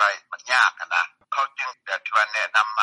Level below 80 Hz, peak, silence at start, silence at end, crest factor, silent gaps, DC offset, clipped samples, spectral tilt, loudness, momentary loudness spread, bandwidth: under -90 dBFS; -4 dBFS; 0 s; 0 s; 18 dB; none; under 0.1%; under 0.1%; 3.5 dB/octave; -22 LUFS; 10 LU; 11.5 kHz